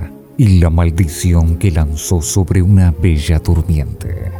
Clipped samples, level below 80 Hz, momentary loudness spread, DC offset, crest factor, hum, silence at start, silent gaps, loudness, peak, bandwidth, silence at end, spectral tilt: under 0.1%; -20 dBFS; 7 LU; under 0.1%; 12 dB; none; 0 s; none; -13 LUFS; 0 dBFS; 15.5 kHz; 0 s; -6.5 dB/octave